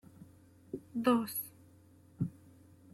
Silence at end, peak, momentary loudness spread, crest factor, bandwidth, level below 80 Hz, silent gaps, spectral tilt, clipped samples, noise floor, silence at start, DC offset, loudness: 0.6 s; -18 dBFS; 17 LU; 20 dB; 15.5 kHz; -72 dBFS; none; -5.5 dB/octave; under 0.1%; -61 dBFS; 0.2 s; under 0.1%; -35 LUFS